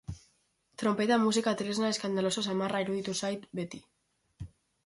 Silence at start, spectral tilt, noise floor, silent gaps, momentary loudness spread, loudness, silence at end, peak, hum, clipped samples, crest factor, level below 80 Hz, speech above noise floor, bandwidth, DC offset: 0.1 s; -4.5 dB/octave; -72 dBFS; none; 22 LU; -31 LUFS; 0.4 s; -16 dBFS; none; under 0.1%; 16 dB; -60 dBFS; 42 dB; 11.5 kHz; under 0.1%